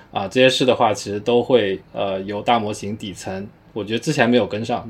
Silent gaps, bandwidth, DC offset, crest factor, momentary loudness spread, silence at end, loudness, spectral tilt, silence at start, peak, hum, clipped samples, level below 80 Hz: none; 14 kHz; under 0.1%; 18 dB; 14 LU; 0 s; -19 LUFS; -5 dB/octave; 0.15 s; -2 dBFS; none; under 0.1%; -56 dBFS